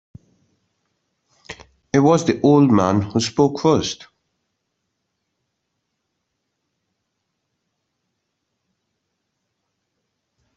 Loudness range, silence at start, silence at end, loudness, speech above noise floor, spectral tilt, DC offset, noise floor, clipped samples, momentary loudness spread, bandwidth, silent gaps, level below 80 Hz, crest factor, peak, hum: 7 LU; 1.5 s; 6.6 s; -17 LUFS; 60 dB; -6 dB/octave; under 0.1%; -76 dBFS; under 0.1%; 24 LU; 8.2 kHz; none; -58 dBFS; 22 dB; -2 dBFS; none